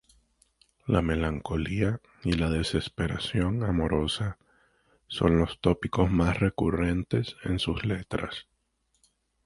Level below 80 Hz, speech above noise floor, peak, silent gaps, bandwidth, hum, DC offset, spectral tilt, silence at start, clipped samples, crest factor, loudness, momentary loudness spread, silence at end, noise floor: -40 dBFS; 47 dB; -8 dBFS; none; 11.5 kHz; none; under 0.1%; -6.5 dB/octave; 0.85 s; under 0.1%; 20 dB; -28 LUFS; 8 LU; 1.05 s; -74 dBFS